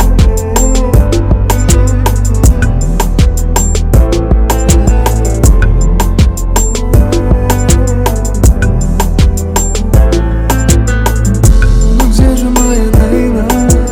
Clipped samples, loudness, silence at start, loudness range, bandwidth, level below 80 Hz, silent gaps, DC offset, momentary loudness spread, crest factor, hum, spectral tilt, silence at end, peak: 4%; -10 LUFS; 0 s; 1 LU; 16.5 kHz; -10 dBFS; none; under 0.1%; 3 LU; 8 dB; none; -5.5 dB/octave; 0 s; 0 dBFS